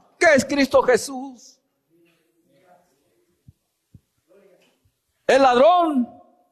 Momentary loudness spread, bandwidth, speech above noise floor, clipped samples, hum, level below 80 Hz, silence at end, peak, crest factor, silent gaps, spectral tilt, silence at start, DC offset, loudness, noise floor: 17 LU; 13.5 kHz; 50 dB; under 0.1%; none; -58 dBFS; 0.45 s; -6 dBFS; 16 dB; none; -3.5 dB/octave; 0.2 s; under 0.1%; -18 LUFS; -68 dBFS